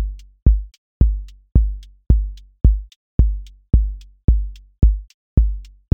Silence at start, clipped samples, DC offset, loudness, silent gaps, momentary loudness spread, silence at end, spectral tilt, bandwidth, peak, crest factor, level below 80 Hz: 0 s; under 0.1%; under 0.1%; -21 LUFS; 0.78-1.00 s, 2.96-3.18 s, 4.24-4.28 s, 5.14-5.37 s; 13 LU; 0.3 s; -10.5 dB/octave; 1.3 kHz; 0 dBFS; 16 dB; -18 dBFS